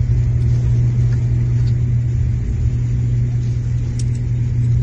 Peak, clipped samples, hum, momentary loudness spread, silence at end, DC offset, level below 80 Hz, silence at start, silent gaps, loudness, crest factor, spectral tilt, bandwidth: -6 dBFS; under 0.1%; none; 4 LU; 0 s; under 0.1%; -24 dBFS; 0 s; none; -18 LUFS; 10 dB; -8.5 dB/octave; 7.6 kHz